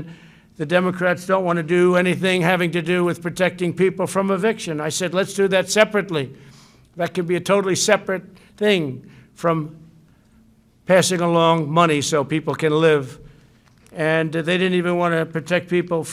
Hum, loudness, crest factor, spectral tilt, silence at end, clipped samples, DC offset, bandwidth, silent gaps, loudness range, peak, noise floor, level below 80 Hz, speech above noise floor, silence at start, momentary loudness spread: none; -19 LUFS; 20 dB; -5 dB/octave; 0 s; under 0.1%; under 0.1%; 15.5 kHz; none; 3 LU; 0 dBFS; -54 dBFS; -60 dBFS; 35 dB; 0 s; 9 LU